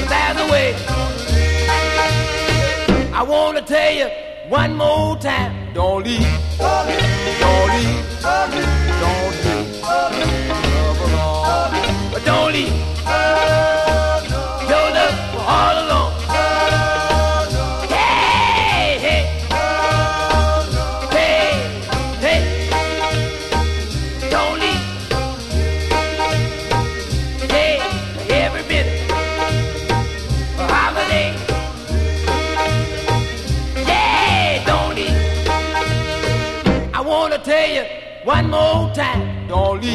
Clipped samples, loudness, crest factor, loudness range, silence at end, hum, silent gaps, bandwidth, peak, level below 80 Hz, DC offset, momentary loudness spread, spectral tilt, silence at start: under 0.1%; -17 LUFS; 16 dB; 3 LU; 0 s; none; none; 13.5 kHz; -2 dBFS; -24 dBFS; under 0.1%; 7 LU; -5 dB/octave; 0 s